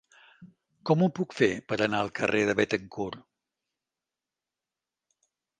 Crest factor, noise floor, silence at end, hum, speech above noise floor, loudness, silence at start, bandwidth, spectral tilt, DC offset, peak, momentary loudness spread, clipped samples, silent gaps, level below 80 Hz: 22 dB; -90 dBFS; 2.4 s; none; 63 dB; -27 LUFS; 0.4 s; 9.6 kHz; -6 dB/octave; under 0.1%; -8 dBFS; 11 LU; under 0.1%; none; -66 dBFS